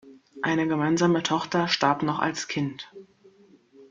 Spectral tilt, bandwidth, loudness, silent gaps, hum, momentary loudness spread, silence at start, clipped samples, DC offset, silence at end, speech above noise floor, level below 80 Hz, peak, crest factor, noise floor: -5 dB/octave; 7.6 kHz; -25 LUFS; none; none; 9 LU; 0.05 s; under 0.1%; under 0.1%; 0.05 s; 31 dB; -66 dBFS; -6 dBFS; 20 dB; -56 dBFS